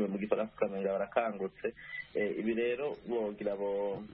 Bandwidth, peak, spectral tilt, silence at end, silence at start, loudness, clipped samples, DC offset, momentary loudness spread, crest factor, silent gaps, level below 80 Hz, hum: 5 kHz; -14 dBFS; -5 dB/octave; 0 s; 0 s; -35 LUFS; under 0.1%; under 0.1%; 6 LU; 20 dB; none; -68 dBFS; none